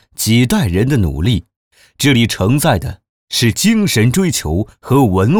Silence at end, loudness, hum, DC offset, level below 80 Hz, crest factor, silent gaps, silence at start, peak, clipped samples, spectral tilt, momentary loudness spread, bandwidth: 0 s; -14 LUFS; none; under 0.1%; -32 dBFS; 12 dB; 1.56-1.71 s, 3.09-3.27 s; 0.2 s; -2 dBFS; under 0.1%; -5 dB/octave; 7 LU; over 20 kHz